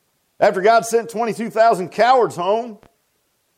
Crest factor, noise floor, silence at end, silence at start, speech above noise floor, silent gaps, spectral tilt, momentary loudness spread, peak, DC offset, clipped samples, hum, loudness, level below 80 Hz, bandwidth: 16 dB; -66 dBFS; 0.85 s; 0.4 s; 50 dB; none; -4 dB/octave; 8 LU; -2 dBFS; under 0.1%; under 0.1%; none; -17 LUFS; -68 dBFS; 16 kHz